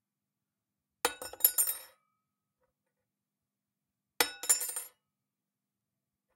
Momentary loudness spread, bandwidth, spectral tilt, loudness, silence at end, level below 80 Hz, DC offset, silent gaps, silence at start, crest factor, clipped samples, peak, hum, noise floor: 15 LU; 16.5 kHz; 1.5 dB/octave; -30 LUFS; 1.45 s; -76 dBFS; under 0.1%; none; 1.05 s; 30 dB; under 0.1%; -8 dBFS; none; -89 dBFS